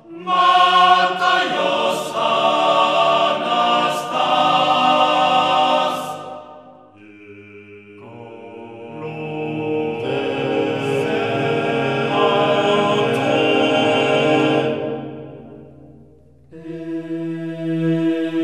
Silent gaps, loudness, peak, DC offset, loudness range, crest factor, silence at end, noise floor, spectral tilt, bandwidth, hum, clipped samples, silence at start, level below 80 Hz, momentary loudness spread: none; -17 LUFS; -2 dBFS; under 0.1%; 12 LU; 18 dB; 0 s; -48 dBFS; -5 dB/octave; 14.5 kHz; none; under 0.1%; 0.1 s; -64 dBFS; 18 LU